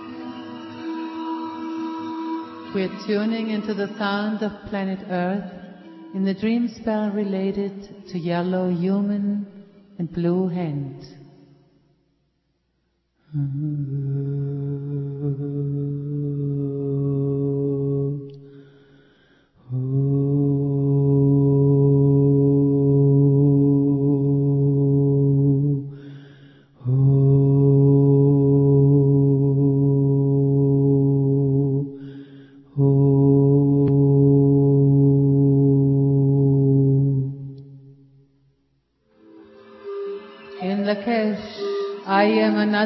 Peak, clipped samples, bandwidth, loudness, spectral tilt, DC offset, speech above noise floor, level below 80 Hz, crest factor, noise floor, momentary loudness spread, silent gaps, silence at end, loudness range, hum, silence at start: -6 dBFS; under 0.1%; 5.8 kHz; -20 LUFS; -10.5 dB/octave; under 0.1%; 46 dB; -50 dBFS; 14 dB; -70 dBFS; 15 LU; none; 0 s; 12 LU; none; 0 s